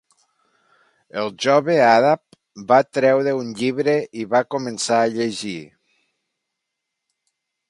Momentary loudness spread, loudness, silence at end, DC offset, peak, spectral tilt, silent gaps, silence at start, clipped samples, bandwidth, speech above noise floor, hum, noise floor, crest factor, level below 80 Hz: 13 LU; -19 LUFS; 2.05 s; under 0.1%; 0 dBFS; -4.5 dB/octave; none; 1.15 s; under 0.1%; 11.5 kHz; 62 dB; none; -80 dBFS; 20 dB; -70 dBFS